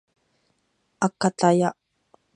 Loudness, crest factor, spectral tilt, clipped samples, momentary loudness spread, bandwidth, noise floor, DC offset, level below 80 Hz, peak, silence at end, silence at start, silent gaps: -23 LUFS; 22 dB; -5.5 dB/octave; under 0.1%; 7 LU; 10.5 kHz; -71 dBFS; under 0.1%; -70 dBFS; -4 dBFS; 0.65 s; 1 s; none